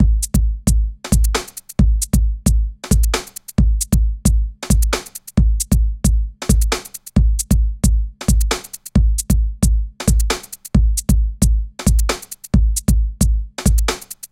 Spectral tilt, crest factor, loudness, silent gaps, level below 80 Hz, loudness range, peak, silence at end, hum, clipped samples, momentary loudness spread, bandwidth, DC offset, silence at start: -5 dB/octave; 16 dB; -18 LUFS; none; -18 dBFS; 1 LU; 0 dBFS; 0.2 s; none; under 0.1%; 5 LU; 16.5 kHz; under 0.1%; 0 s